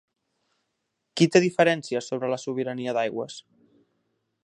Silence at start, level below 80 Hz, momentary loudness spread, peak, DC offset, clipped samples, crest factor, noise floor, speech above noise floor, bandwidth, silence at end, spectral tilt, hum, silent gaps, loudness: 1.15 s; -74 dBFS; 16 LU; -4 dBFS; under 0.1%; under 0.1%; 22 dB; -79 dBFS; 55 dB; 11 kHz; 1.05 s; -5 dB/octave; none; none; -24 LUFS